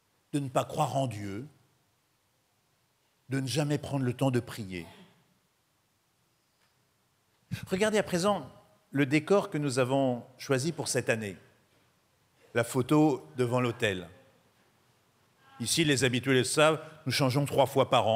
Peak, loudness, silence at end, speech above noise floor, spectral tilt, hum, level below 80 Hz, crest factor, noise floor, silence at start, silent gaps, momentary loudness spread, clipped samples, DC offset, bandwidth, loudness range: -10 dBFS; -29 LUFS; 0 s; 44 dB; -5 dB/octave; none; -68 dBFS; 22 dB; -73 dBFS; 0.35 s; none; 14 LU; under 0.1%; under 0.1%; 16 kHz; 7 LU